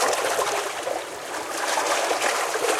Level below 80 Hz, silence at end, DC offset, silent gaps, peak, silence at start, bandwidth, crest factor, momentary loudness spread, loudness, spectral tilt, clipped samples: -68 dBFS; 0 s; under 0.1%; none; -10 dBFS; 0 s; 16.5 kHz; 16 dB; 8 LU; -24 LUFS; 0 dB/octave; under 0.1%